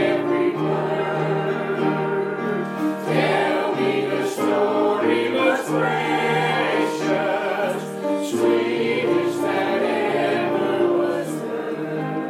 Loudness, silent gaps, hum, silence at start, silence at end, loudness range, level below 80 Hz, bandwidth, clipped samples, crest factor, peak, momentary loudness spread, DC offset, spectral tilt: -21 LUFS; none; none; 0 s; 0 s; 2 LU; -74 dBFS; 15.5 kHz; under 0.1%; 14 dB; -6 dBFS; 5 LU; under 0.1%; -6 dB/octave